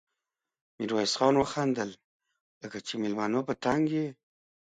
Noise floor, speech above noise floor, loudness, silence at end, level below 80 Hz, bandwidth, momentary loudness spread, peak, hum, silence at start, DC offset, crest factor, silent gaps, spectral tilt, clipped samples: -88 dBFS; 59 dB; -29 LUFS; 0.65 s; -66 dBFS; 9.4 kHz; 13 LU; -10 dBFS; none; 0.8 s; under 0.1%; 20 dB; 2.04-2.19 s, 2.41-2.61 s; -5 dB/octave; under 0.1%